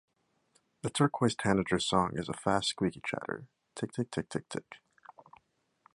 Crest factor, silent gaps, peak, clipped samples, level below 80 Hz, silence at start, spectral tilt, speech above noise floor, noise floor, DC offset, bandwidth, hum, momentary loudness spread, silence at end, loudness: 24 dB; none; -10 dBFS; under 0.1%; -60 dBFS; 0.85 s; -5 dB/octave; 41 dB; -72 dBFS; under 0.1%; 11.5 kHz; none; 14 LU; 1.2 s; -32 LUFS